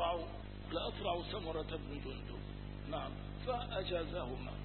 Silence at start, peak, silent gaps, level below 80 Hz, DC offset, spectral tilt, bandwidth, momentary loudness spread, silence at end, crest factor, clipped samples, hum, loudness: 0 s; -24 dBFS; none; -50 dBFS; under 0.1%; -4 dB/octave; 4.3 kHz; 8 LU; 0 s; 18 dB; under 0.1%; 50 Hz at -45 dBFS; -42 LUFS